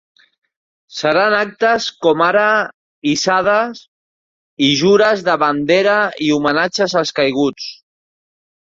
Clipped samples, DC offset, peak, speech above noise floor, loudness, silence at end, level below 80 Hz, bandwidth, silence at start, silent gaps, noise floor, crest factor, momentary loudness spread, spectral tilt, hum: under 0.1%; under 0.1%; 0 dBFS; over 75 dB; -15 LUFS; 0.9 s; -58 dBFS; 7.8 kHz; 0.9 s; 2.74-3.02 s, 3.88-4.57 s; under -90 dBFS; 16 dB; 8 LU; -4 dB/octave; none